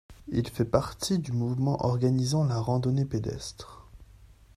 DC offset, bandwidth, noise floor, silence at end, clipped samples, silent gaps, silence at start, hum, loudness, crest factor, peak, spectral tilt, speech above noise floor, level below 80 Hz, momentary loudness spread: under 0.1%; 14 kHz; -54 dBFS; 0.3 s; under 0.1%; none; 0.1 s; none; -28 LUFS; 20 dB; -8 dBFS; -6.5 dB/octave; 26 dB; -50 dBFS; 11 LU